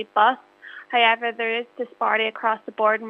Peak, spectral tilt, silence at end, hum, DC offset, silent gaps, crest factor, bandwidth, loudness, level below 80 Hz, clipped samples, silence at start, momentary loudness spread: -4 dBFS; -4.5 dB/octave; 0 s; none; under 0.1%; none; 18 dB; 5.6 kHz; -22 LUFS; -86 dBFS; under 0.1%; 0 s; 15 LU